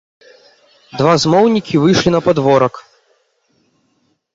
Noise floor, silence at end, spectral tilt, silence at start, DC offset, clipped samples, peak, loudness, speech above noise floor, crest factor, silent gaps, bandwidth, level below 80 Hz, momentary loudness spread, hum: -62 dBFS; 1.55 s; -5.5 dB/octave; 0.95 s; under 0.1%; under 0.1%; -2 dBFS; -13 LUFS; 50 dB; 14 dB; none; 7.8 kHz; -48 dBFS; 6 LU; none